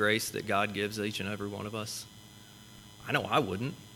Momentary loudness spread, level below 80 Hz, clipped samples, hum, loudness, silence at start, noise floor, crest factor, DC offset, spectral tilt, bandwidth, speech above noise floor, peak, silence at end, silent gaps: 22 LU; -66 dBFS; under 0.1%; none; -32 LUFS; 0 s; -52 dBFS; 22 dB; under 0.1%; -4 dB/octave; 19 kHz; 20 dB; -12 dBFS; 0 s; none